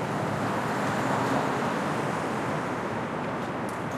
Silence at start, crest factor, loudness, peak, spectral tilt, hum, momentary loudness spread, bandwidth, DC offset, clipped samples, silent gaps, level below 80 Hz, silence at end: 0 s; 14 dB; -29 LUFS; -14 dBFS; -5.5 dB/octave; none; 5 LU; 15 kHz; under 0.1%; under 0.1%; none; -60 dBFS; 0 s